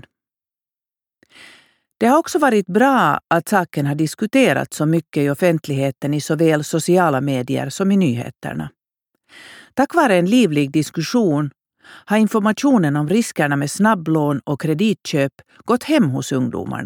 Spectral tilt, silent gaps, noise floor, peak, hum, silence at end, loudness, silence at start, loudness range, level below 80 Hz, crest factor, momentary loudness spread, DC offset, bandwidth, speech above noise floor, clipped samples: -6 dB/octave; none; under -90 dBFS; -2 dBFS; none; 0 s; -18 LUFS; 2 s; 2 LU; -60 dBFS; 16 dB; 7 LU; under 0.1%; 19 kHz; over 73 dB; under 0.1%